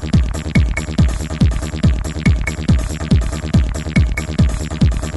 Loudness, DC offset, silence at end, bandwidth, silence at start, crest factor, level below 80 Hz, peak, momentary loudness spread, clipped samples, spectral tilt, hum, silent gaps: -17 LUFS; under 0.1%; 0 s; 12 kHz; 0 s; 14 dB; -20 dBFS; -2 dBFS; 1 LU; under 0.1%; -6.5 dB/octave; none; none